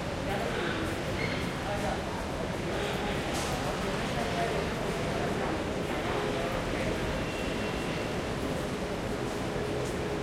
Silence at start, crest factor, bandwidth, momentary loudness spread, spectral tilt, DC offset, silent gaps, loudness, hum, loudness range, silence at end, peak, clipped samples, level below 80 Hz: 0 s; 14 dB; 16.5 kHz; 2 LU; -5 dB/octave; under 0.1%; none; -32 LUFS; none; 1 LU; 0 s; -18 dBFS; under 0.1%; -44 dBFS